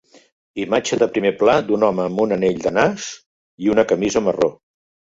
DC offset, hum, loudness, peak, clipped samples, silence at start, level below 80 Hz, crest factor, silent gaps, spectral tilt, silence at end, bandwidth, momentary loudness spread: under 0.1%; none; -18 LUFS; -2 dBFS; under 0.1%; 0.55 s; -54 dBFS; 18 dB; 3.26-3.58 s; -5 dB/octave; 0.6 s; 7.8 kHz; 12 LU